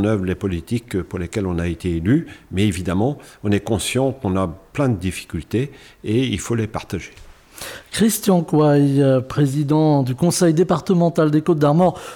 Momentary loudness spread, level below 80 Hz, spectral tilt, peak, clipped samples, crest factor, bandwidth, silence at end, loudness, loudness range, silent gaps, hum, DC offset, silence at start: 12 LU; -44 dBFS; -6.5 dB/octave; -6 dBFS; under 0.1%; 12 dB; 18.5 kHz; 0 s; -19 LUFS; 7 LU; none; none; under 0.1%; 0 s